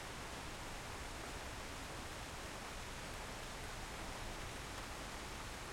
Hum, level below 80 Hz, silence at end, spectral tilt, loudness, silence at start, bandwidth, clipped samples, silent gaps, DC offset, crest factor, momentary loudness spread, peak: none; -54 dBFS; 0 s; -3 dB/octave; -47 LUFS; 0 s; 16.5 kHz; under 0.1%; none; under 0.1%; 14 dB; 1 LU; -34 dBFS